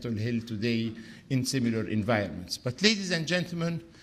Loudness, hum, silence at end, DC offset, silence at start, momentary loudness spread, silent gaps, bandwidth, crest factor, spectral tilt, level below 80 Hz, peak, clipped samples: -29 LUFS; none; 0 s; under 0.1%; 0 s; 9 LU; none; 15.5 kHz; 26 dB; -4.5 dB/octave; -60 dBFS; -4 dBFS; under 0.1%